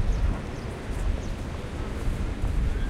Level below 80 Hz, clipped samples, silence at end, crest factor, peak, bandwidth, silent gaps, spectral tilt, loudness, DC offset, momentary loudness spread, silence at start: -28 dBFS; under 0.1%; 0 s; 14 dB; -14 dBFS; 12 kHz; none; -6.5 dB/octave; -32 LUFS; under 0.1%; 5 LU; 0 s